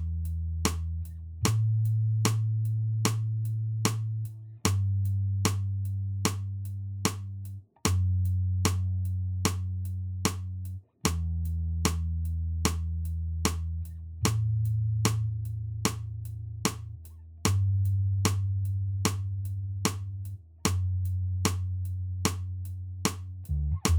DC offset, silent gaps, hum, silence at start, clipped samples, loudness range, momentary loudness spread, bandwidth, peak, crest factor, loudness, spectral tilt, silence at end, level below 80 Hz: under 0.1%; none; none; 0 s; under 0.1%; 3 LU; 10 LU; over 20 kHz; -8 dBFS; 22 dB; -30 LUFS; -5 dB/octave; 0 s; -42 dBFS